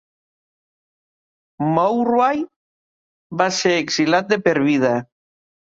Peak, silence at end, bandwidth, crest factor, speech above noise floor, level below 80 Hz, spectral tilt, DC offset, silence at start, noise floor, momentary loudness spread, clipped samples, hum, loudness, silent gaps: -2 dBFS; 0.7 s; 7.8 kHz; 18 dB; over 72 dB; -64 dBFS; -4.5 dB/octave; under 0.1%; 1.6 s; under -90 dBFS; 8 LU; under 0.1%; none; -18 LUFS; 2.56-3.30 s